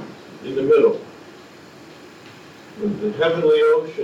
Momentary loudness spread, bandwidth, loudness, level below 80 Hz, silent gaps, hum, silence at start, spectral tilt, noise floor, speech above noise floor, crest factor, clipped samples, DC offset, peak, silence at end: 22 LU; 7.8 kHz; -19 LUFS; -64 dBFS; none; none; 0 s; -6.5 dB/octave; -43 dBFS; 25 dB; 16 dB; under 0.1%; under 0.1%; -6 dBFS; 0 s